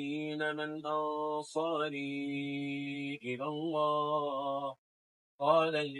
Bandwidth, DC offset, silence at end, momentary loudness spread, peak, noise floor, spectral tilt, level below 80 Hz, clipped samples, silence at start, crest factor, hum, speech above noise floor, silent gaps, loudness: 11.5 kHz; under 0.1%; 0 s; 9 LU; -16 dBFS; under -90 dBFS; -5.5 dB/octave; under -90 dBFS; under 0.1%; 0 s; 20 dB; none; over 56 dB; 4.78-5.39 s; -34 LUFS